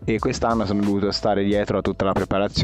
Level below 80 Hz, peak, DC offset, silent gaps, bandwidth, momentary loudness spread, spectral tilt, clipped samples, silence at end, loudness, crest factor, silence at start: -40 dBFS; -8 dBFS; under 0.1%; none; 11 kHz; 2 LU; -6 dB/octave; under 0.1%; 0 s; -22 LUFS; 14 dB; 0 s